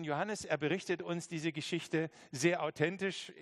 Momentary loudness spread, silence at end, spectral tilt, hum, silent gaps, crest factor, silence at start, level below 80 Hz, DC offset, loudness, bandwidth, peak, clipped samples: 6 LU; 0 s; -4.5 dB/octave; none; none; 20 dB; 0 s; -78 dBFS; under 0.1%; -36 LUFS; 13 kHz; -16 dBFS; under 0.1%